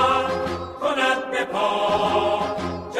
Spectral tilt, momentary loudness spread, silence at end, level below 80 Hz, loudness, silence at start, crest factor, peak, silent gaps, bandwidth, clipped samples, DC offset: -4.5 dB/octave; 6 LU; 0 s; -52 dBFS; -22 LUFS; 0 s; 16 dB; -8 dBFS; none; 14 kHz; under 0.1%; under 0.1%